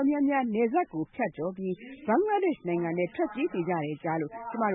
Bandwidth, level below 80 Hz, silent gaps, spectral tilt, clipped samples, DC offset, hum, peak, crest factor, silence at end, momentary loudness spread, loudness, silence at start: 3.9 kHz; -68 dBFS; none; -11 dB/octave; under 0.1%; under 0.1%; none; -14 dBFS; 14 dB; 0 s; 8 LU; -29 LUFS; 0 s